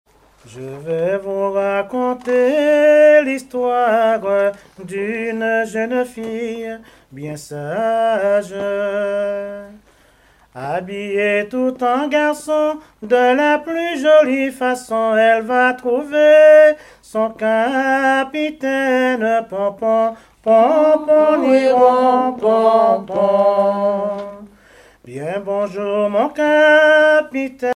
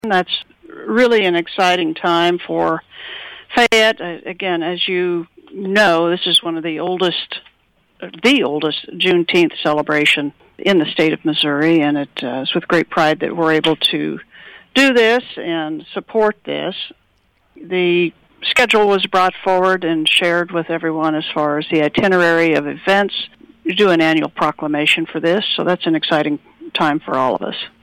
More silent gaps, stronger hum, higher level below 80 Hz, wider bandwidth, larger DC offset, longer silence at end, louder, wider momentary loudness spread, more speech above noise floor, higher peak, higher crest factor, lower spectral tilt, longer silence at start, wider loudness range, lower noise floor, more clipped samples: neither; neither; about the same, -58 dBFS vs -56 dBFS; second, 12.5 kHz vs 18 kHz; neither; second, 0 s vs 0.15 s; about the same, -15 LUFS vs -16 LUFS; about the same, 14 LU vs 12 LU; second, 36 dB vs 43 dB; about the same, 0 dBFS vs -2 dBFS; about the same, 14 dB vs 14 dB; about the same, -5 dB/octave vs -4.5 dB/octave; first, 0.5 s vs 0.05 s; first, 8 LU vs 3 LU; second, -52 dBFS vs -59 dBFS; neither